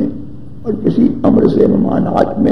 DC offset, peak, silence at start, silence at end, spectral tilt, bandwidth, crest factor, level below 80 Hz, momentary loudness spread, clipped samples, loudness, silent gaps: 4%; 0 dBFS; 0 s; 0 s; -10 dB/octave; 6.2 kHz; 14 dB; -36 dBFS; 15 LU; under 0.1%; -13 LUFS; none